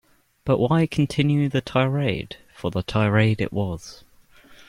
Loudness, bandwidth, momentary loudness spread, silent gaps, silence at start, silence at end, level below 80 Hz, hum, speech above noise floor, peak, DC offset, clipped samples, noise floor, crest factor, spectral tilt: -22 LUFS; 12 kHz; 13 LU; none; 0.45 s; 0.15 s; -48 dBFS; none; 30 dB; -6 dBFS; under 0.1%; under 0.1%; -51 dBFS; 16 dB; -7 dB/octave